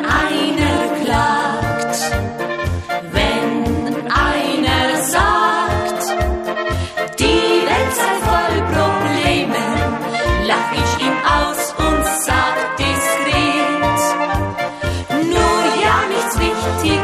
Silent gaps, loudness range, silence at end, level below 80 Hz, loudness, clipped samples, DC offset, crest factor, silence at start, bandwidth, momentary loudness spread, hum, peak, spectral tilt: none; 2 LU; 0 s; -30 dBFS; -16 LUFS; under 0.1%; under 0.1%; 14 dB; 0 s; 15 kHz; 6 LU; none; -2 dBFS; -4 dB/octave